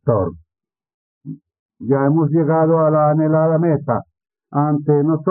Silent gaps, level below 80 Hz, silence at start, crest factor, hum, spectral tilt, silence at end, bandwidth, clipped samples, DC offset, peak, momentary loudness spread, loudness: 0.94-1.21 s, 1.59-1.69 s; -60 dBFS; 0.05 s; 16 dB; none; -13 dB/octave; 0 s; 2.5 kHz; under 0.1%; under 0.1%; -2 dBFS; 13 LU; -17 LUFS